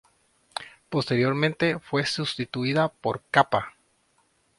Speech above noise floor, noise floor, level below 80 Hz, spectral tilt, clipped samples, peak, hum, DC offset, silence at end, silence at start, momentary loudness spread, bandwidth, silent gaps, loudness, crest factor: 42 dB; -67 dBFS; -62 dBFS; -5.5 dB/octave; under 0.1%; -4 dBFS; none; under 0.1%; 0.9 s; 0.55 s; 15 LU; 11.5 kHz; none; -25 LUFS; 24 dB